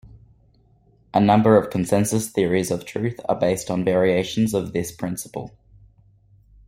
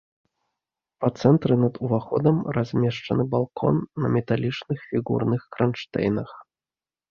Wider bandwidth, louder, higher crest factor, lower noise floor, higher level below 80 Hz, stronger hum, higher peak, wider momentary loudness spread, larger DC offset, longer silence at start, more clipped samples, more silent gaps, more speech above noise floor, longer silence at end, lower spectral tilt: first, 16 kHz vs 7 kHz; first, -21 LUFS vs -24 LUFS; about the same, 20 dB vs 20 dB; second, -57 dBFS vs under -90 dBFS; about the same, -54 dBFS vs -56 dBFS; neither; about the same, -2 dBFS vs -4 dBFS; first, 12 LU vs 8 LU; neither; second, 0.05 s vs 1 s; neither; neither; second, 37 dB vs over 67 dB; first, 1.2 s vs 0.7 s; second, -6 dB/octave vs -8.5 dB/octave